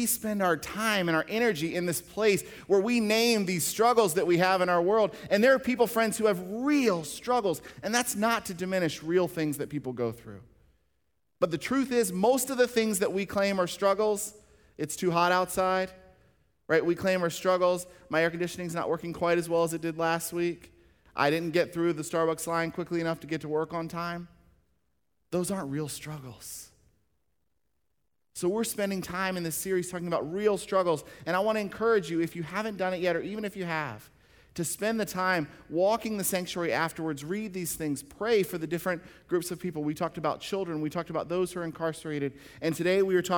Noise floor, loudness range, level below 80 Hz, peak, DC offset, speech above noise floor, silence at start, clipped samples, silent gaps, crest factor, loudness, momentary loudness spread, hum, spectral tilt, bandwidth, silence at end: -81 dBFS; 9 LU; -64 dBFS; -10 dBFS; under 0.1%; 53 dB; 0 s; under 0.1%; none; 20 dB; -29 LUFS; 10 LU; none; -4.5 dB/octave; over 20 kHz; 0 s